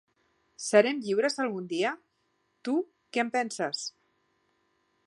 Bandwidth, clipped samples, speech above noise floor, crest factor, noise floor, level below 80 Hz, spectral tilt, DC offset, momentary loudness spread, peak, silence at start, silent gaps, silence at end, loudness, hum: 11.5 kHz; under 0.1%; 47 dB; 24 dB; -74 dBFS; -84 dBFS; -3.5 dB/octave; under 0.1%; 14 LU; -6 dBFS; 0.6 s; none; 1.15 s; -29 LUFS; none